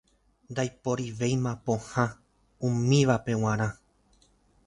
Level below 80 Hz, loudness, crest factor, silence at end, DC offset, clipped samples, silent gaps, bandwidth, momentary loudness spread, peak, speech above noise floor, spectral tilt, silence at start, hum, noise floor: -56 dBFS; -28 LUFS; 20 dB; 0.95 s; under 0.1%; under 0.1%; none; 11 kHz; 9 LU; -10 dBFS; 37 dB; -6 dB/octave; 0.5 s; none; -64 dBFS